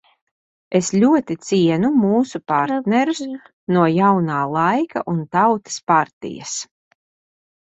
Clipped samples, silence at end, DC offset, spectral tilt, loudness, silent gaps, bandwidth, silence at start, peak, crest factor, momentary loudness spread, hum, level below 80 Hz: under 0.1%; 1.1 s; under 0.1%; -5.5 dB/octave; -18 LUFS; 3.53-3.67 s, 5.83-5.87 s, 6.13-6.21 s; 8.2 kHz; 0.7 s; -2 dBFS; 16 dB; 11 LU; none; -62 dBFS